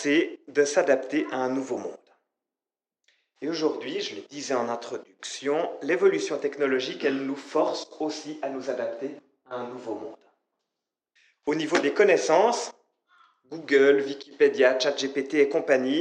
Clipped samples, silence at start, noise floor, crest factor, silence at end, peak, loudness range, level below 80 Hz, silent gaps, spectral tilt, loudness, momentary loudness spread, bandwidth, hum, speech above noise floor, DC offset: under 0.1%; 0 s; under -90 dBFS; 18 dB; 0 s; -8 dBFS; 9 LU; -86 dBFS; none; -3.5 dB/octave; -25 LUFS; 16 LU; 9.2 kHz; none; over 65 dB; under 0.1%